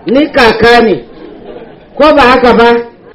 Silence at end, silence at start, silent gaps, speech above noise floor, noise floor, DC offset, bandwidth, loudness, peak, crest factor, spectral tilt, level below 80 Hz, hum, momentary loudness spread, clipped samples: 0.25 s; 0.05 s; none; 23 dB; -29 dBFS; under 0.1%; 12 kHz; -6 LUFS; 0 dBFS; 8 dB; -5.5 dB/octave; -32 dBFS; none; 7 LU; 3%